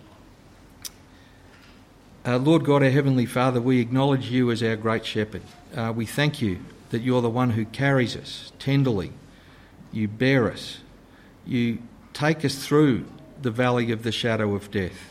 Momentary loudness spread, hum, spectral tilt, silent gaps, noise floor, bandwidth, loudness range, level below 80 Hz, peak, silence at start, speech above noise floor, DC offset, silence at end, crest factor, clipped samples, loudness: 16 LU; none; -6.5 dB/octave; none; -50 dBFS; 15.5 kHz; 5 LU; -54 dBFS; -8 dBFS; 0.85 s; 27 dB; under 0.1%; 0 s; 16 dB; under 0.1%; -24 LUFS